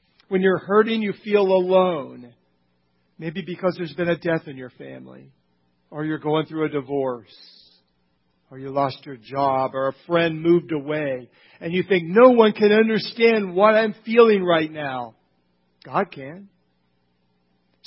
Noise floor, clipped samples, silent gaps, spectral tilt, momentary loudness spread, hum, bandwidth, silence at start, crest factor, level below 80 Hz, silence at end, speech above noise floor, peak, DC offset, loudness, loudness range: -68 dBFS; under 0.1%; none; -10.5 dB/octave; 20 LU; none; 5.8 kHz; 0.3 s; 22 dB; -66 dBFS; 1.4 s; 48 dB; 0 dBFS; under 0.1%; -20 LUFS; 11 LU